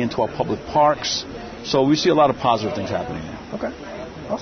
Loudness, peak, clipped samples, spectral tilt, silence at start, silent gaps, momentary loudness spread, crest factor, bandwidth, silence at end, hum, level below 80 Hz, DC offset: -21 LUFS; -4 dBFS; under 0.1%; -5 dB/octave; 0 s; none; 15 LU; 18 dB; 6.6 kHz; 0 s; none; -48 dBFS; under 0.1%